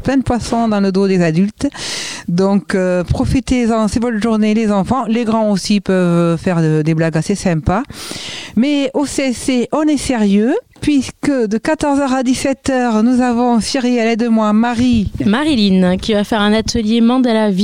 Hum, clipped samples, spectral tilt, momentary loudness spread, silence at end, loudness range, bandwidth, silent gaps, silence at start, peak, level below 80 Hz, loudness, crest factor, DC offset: none; under 0.1%; -6 dB/octave; 4 LU; 0 s; 2 LU; 15 kHz; none; 0 s; -2 dBFS; -36 dBFS; -14 LUFS; 12 dB; 0.6%